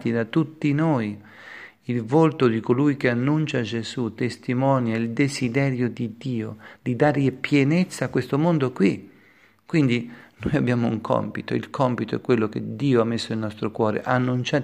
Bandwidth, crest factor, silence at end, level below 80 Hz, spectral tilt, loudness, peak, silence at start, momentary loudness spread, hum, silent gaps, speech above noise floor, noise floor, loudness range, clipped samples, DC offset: 12.5 kHz; 18 dB; 0 s; -58 dBFS; -7 dB/octave; -23 LUFS; -4 dBFS; 0 s; 9 LU; none; none; 33 dB; -56 dBFS; 2 LU; under 0.1%; under 0.1%